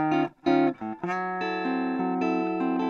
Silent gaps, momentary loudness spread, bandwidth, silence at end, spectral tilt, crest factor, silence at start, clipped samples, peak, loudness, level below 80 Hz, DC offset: none; 6 LU; 6.8 kHz; 0 s; -7.5 dB/octave; 16 dB; 0 s; under 0.1%; -10 dBFS; -27 LUFS; -68 dBFS; under 0.1%